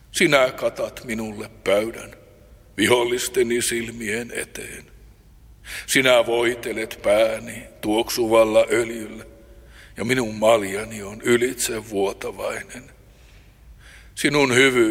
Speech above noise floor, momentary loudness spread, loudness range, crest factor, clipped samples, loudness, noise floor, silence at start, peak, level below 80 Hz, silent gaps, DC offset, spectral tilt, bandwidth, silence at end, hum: 28 dB; 18 LU; 4 LU; 22 dB; under 0.1%; -21 LUFS; -49 dBFS; 0.15 s; -2 dBFS; -50 dBFS; none; under 0.1%; -3.5 dB/octave; 16.5 kHz; 0 s; none